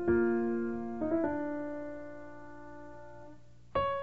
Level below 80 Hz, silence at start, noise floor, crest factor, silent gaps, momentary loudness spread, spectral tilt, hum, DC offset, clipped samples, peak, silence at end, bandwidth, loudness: -56 dBFS; 0 s; -56 dBFS; 16 dB; none; 20 LU; -8.5 dB/octave; 60 Hz at -60 dBFS; 0.4%; under 0.1%; -18 dBFS; 0 s; 4.8 kHz; -34 LUFS